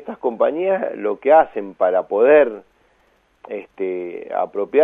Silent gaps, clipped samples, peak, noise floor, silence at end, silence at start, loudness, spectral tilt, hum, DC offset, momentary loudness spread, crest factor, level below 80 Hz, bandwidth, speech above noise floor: none; under 0.1%; -2 dBFS; -60 dBFS; 0 s; 0 s; -18 LUFS; -8 dB/octave; none; under 0.1%; 15 LU; 18 dB; -64 dBFS; 3.8 kHz; 42 dB